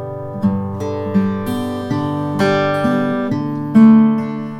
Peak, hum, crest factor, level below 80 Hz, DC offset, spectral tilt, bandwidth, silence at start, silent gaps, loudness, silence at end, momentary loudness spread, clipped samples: 0 dBFS; none; 14 dB; -52 dBFS; under 0.1%; -8 dB/octave; 12.5 kHz; 0 s; none; -16 LUFS; 0 s; 12 LU; under 0.1%